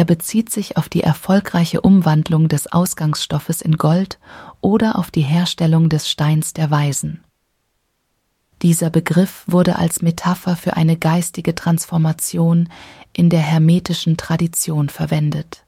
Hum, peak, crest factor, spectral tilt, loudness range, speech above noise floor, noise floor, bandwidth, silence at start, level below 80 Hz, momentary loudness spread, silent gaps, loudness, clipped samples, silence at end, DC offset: none; 0 dBFS; 16 dB; -6 dB/octave; 3 LU; 52 dB; -68 dBFS; 16 kHz; 0 s; -48 dBFS; 6 LU; none; -17 LUFS; under 0.1%; 0.15 s; under 0.1%